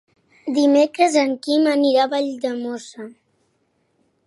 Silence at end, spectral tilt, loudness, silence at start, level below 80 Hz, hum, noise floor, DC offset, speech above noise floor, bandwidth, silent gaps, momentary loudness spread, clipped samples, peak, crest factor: 1.15 s; -3 dB/octave; -18 LUFS; 0.45 s; -78 dBFS; none; -67 dBFS; under 0.1%; 48 dB; 11.5 kHz; none; 18 LU; under 0.1%; -2 dBFS; 18 dB